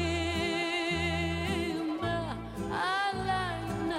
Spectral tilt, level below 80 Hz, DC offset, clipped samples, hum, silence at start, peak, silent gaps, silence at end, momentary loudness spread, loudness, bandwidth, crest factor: -5 dB/octave; -46 dBFS; under 0.1%; under 0.1%; none; 0 s; -18 dBFS; none; 0 s; 5 LU; -31 LUFS; 15.5 kHz; 14 dB